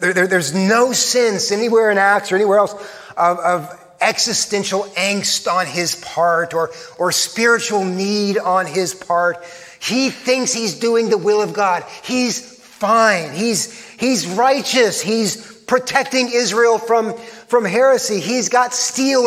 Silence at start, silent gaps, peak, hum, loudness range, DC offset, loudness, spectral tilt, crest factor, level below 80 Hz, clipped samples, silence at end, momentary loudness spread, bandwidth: 0 s; none; 0 dBFS; none; 2 LU; under 0.1%; -16 LUFS; -3 dB/octave; 16 dB; -66 dBFS; under 0.1%; 0 s; 8 LU; 16 kHz